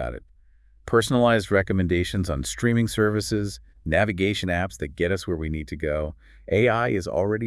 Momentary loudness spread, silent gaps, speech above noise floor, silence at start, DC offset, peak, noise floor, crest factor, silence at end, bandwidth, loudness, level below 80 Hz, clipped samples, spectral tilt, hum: 10 LU; none; 32 dB; 0 s; under 0.1%; -6 dBFS; -55 dBFS; 18 dB; 0 s; 12 kHz; -24 LUFS; -42 dBFS; under 0.1%; -5.5 dB/octave; none